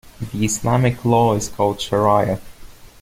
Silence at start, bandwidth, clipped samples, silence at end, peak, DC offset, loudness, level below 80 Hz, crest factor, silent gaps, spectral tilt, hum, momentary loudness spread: 0.05 s; 16 kHz; under 0.1%; 0.15 s; -2 dBFS; under 0.1%; -18 LUFS; -42 dBFS; 16 dB; none; -5.5 dB/octave; none; 7 LU